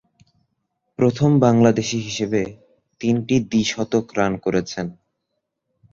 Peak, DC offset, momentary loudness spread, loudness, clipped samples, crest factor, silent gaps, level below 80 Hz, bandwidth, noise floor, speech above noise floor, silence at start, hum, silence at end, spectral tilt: -2 dBFS; under 0.1%; 14 LU; -20 LUFS; under 0.1%; 20 dB; none; -54 dBFS; 7.6 kHz; -77 dBFS; 58 dB; 1 s; none; 1 s; -6 dB/octave